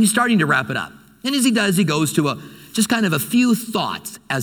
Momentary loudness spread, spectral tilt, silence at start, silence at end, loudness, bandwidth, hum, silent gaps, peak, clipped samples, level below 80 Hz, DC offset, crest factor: 11 LU; -4 dB/octave; 0 s; 0 s; -19 LUFS; 19 kHz; none; none; -2 dBFS; under 0.1%; -60 dBFS; under 0.1%; 16 dB